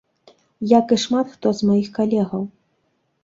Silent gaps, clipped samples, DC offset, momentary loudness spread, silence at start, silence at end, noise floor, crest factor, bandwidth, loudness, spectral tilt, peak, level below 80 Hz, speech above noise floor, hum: none; under 0.1%; under 0.1%; 12 LU; 0.6 s; 0.75 s; -68 dBFS; 18 dB; 7.8 kHz; -19 LUFS; -6 dB/octave; -2 dBFS; -60 dBFS; 50 dB; none